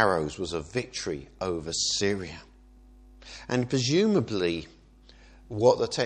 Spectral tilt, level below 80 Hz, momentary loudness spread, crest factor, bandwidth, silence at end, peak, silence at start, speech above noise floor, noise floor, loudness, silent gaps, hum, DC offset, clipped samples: -4.5 dB/octave; -52 dBFS; 15 LU; 24 dB; 11 kHz; 0 s; -6 dBFS; 0 s; 27 dB; -54 dBFS; -27 LUFS; none; none; under 0.1%; under 0.1%